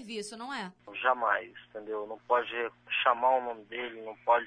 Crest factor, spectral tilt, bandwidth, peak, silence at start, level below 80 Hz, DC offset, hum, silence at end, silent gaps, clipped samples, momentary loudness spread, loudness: 22 dB; -3 dB/octave; 10.5 kHz; -10 dBFS; 0 s; -76 dBFS; under 0.1%; none; 0 s; none; under 0.1%; 12 LU; -31 LUFS